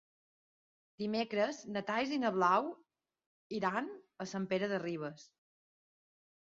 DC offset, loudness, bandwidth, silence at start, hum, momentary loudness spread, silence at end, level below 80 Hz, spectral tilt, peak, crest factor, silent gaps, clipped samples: under 0.1%; -36 LUFS; 7.4 kHz; 1 s; none; 14 LU; 1.25 s; -80 dBFS; -4 dB/octave; -16 dBFS; 22 dB; 3.26-3.50 s; under 0.1%